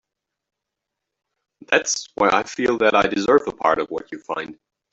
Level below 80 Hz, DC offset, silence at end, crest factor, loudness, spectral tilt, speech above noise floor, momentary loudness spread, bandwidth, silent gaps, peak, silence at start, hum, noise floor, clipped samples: -56 dBFS; under 0.1%; 0.4 s; 20 dB; -20 LUFS; -3 dB/octave; 63 dB; 12 LU; 8.2 kHz; none; -2 dBFS; 1.7 s; none; -83 dBFS; under 0.1%